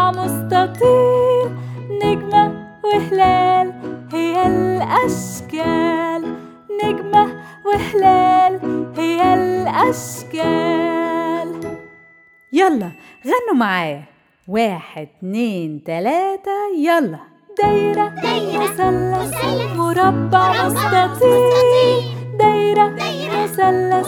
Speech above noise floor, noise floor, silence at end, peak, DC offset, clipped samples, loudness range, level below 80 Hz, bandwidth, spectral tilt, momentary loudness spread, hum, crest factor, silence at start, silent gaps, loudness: 33 dB; -49 dBFS; 0 s; 0 dBFS; under 0.1%; under 0.1%; 6 LU; -48 dBFS; 18.5 kHz; -5.5 dB/octave; 12 LU; none; 16 dB; 0 s; none; -17 LUFS